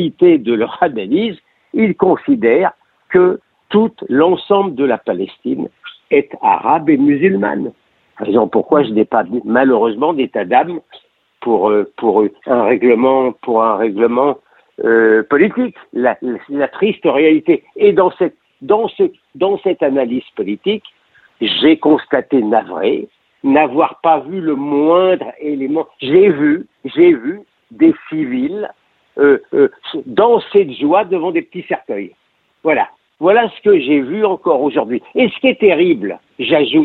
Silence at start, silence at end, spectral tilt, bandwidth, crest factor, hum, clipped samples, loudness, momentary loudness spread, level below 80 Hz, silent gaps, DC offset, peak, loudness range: 0 s; 0 s; -9 dB/octave; 4.3 kHz; 14 dB; none; under 0.1%; -14 LUFS; 10 LU; -58 dBFS; none; under 0.1%; 0 dBFS; 2 LU